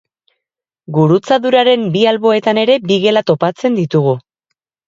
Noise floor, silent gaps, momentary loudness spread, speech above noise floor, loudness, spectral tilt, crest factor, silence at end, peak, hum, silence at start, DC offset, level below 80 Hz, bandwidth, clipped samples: -80 dBFS; none; 5 LU; 68 dB; -13 LUFS; -6.5 dB/octave; 14 dB; 0.7 s; 0 dBFS; none; 0.9 s; under 0.1%; -60 dBFS; 7.6 kHz; under 0.1%